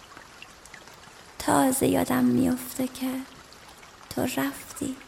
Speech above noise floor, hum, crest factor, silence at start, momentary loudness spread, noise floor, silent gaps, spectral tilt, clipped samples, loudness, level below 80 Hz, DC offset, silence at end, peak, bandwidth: 23 dB; none; 20 dB; 0 s; 24 LU; -48 dBFS; none; -4.5 dB/octave; under 0.1%; -26 LUFS; -56 dBFS; under 0.1%; 0 s; -8 dBFS; 16.5 kHz